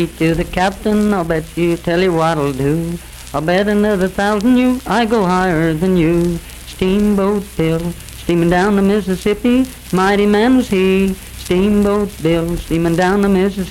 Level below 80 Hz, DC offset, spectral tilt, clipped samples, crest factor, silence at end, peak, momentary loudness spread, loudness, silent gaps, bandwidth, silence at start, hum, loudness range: -32 dBFS; under 0.1%; -6.5 dB/octave; under 0.1%; 12 dB; 0 s; -2 dBFS; 7 LU; -15 LUFS; none; 16.5 kHz; 0 s; none; 2 LU